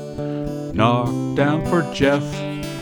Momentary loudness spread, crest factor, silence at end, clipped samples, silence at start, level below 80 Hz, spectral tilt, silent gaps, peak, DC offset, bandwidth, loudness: 9 LU; 18 dB; 0 s; under 0.1%; 0 s; -42 dBFS; -6.5 dB/octave; none; -2 dBFS; under 0.1%; 19.5 kHz; -21 LUFS